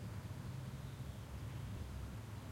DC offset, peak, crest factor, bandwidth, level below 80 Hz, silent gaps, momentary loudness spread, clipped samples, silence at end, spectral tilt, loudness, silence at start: under 0.1%; -36 dBFS; 12 dB; 16.5 kHz; -54 dBFS; none; 2 LU; under 0.1%; 0 s; -6 dB/octave; -49 LUFS; 0 s